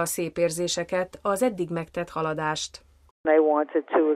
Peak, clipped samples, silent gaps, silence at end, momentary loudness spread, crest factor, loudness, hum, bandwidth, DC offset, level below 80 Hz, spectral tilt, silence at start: -8 dBFS; under 0.1%; 3.11-3.24 s; 0 s; 10 LU; 18 dB; -26 LUFS; none; 15 kHz; under 0.1%; -60 dBFS; -4 dB/octave; 0 s